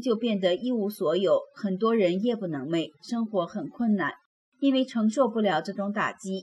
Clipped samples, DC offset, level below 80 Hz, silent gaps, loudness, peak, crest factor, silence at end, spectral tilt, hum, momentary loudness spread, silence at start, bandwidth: under 0.1%; under 0.1%; -76 dBFS; 4.26-4.52 s; -27 LUFS; -12 dBFS; 14 dB; 0 s; -6 dB/octave; none; 7 LU; 0 s; 12.5 kHz